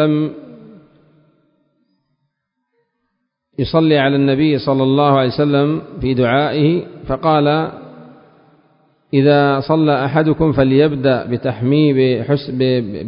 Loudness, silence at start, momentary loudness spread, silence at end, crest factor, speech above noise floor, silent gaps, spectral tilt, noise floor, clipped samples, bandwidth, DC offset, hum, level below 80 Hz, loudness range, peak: -15 LUFS; 0 s; 8 LU; 0 s; 16 dB; 58 dB; none; -12.5 dB/octave; -72 dBFS; under 0.1%; 5.4 kHz; under 0.1%; none; -44 dBFS; 5 LU; 0 dBFS